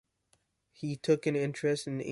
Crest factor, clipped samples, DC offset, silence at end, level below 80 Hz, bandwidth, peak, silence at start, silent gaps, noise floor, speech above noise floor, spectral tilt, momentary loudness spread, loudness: 18 dB; under 0.1%; under 0.1%; 0 s; -72 dBFS; 11.5 kHz; -14 dBFS; 0.8 s; none; -74 dBFS; 43 dB; -6 dB/octave; 10 LU; -32 LUFS